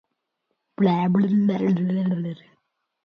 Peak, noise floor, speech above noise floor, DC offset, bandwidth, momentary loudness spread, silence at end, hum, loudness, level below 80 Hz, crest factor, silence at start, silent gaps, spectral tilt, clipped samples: -8 dBFS; -77 dBFS; 56 dB; under 0.1%; 5.2 kHz; 10 LU; 0.7 s; none; -22 LUFS; -68 dBFS; 16 dB; 0.8 s; none; -10 dB/octave; under 0.1%